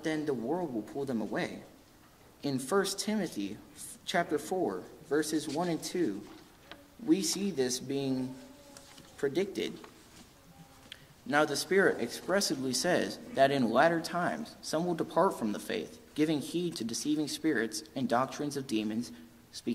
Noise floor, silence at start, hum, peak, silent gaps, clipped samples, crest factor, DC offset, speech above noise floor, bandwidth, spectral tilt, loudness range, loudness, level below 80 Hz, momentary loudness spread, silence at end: -59 dBFS; 0 s; none; -10 dBFS; none; under 0.1%; 22 dB; under 0.1%; 27 dB; 16 kHz; -4 dB/octave; 6 LU; -32 LUFS; -68 dBFS; 19 LU; 0 s